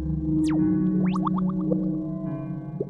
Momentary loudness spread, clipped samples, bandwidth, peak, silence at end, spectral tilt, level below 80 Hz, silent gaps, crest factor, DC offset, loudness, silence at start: 9 LU; under 0.1%; 8.4 kHz; -12 dBFS; 0 s; -9.5 dB/octave; -42 dBFS; none; 14 dB; under 0.1%; -25 LUFS; 0 s